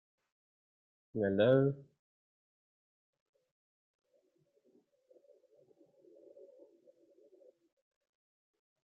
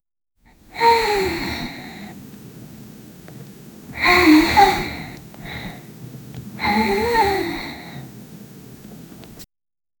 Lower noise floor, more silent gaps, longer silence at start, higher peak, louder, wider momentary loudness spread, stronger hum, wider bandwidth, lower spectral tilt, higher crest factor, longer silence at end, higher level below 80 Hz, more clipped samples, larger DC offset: first, -76 dBFS vs -59 dBFS; neither; first, 1.15 s vs 0.75 s; second, -16 dBFS vs 0 dBFS; second, -31 LUFS vs -17 LUFS; second, 18 LU vs 26 LU; neither; second, 4.2 kHz vs over 20 kHz; first, -6.5 dB/octave vs -4.5 dB/octave; about the same, 24 dB vs 22 dB; first, 7.05 s vs 0.55 s; second, -80 dBFS vs -42 dBFS; neither; neither